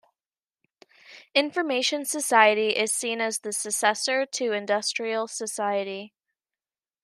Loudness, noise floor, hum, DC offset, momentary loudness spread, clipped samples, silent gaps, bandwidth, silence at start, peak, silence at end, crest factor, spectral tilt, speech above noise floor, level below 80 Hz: -24 LUFS; under -90 dBFS; none; under 0.1%; 10 LU; under 0.1%; none; 14 kHz; 1.1 s; -4 dBFS; 0.95 s; 24 dB; -1 dB/octave; over 65 dB; -86 dBFS